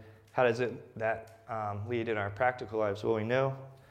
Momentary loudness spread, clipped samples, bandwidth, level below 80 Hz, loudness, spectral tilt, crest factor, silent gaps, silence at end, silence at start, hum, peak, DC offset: 9 LU; under 0.1%; 10 kHz; -68 dBFS; -33 LUFS; -7 dB/octave; 18 dB; none; 0.15 s; 0 s; none; -14 dBFS; under 0.1%